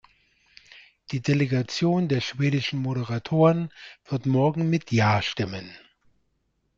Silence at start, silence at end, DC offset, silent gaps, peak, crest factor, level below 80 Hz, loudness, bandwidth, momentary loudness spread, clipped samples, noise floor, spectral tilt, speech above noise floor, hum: 0.75 s; 1 s; under 0.1%; none; -8 dBFS; 18 dB; -60 dBFS; -24 LUFS; 7.6 kHz; 12 LU; under 0.1%; -72 dBFS; -6.5 dB/octave; 49 dB; none